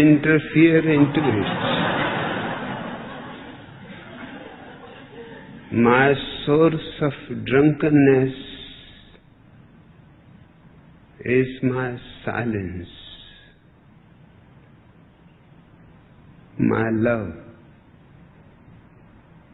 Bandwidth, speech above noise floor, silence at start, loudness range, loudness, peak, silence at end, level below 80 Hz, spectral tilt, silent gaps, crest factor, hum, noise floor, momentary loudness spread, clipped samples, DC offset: 4.1 kHz; 33 dB; 0 s; 14 LU; -20 LUFS; -2 dBFS; 2.05 s; -52 dBFS; -11 dB/octave; none; 20 dB; none; -52 dBFS; 25 LU; under 0.1%; under 0.1%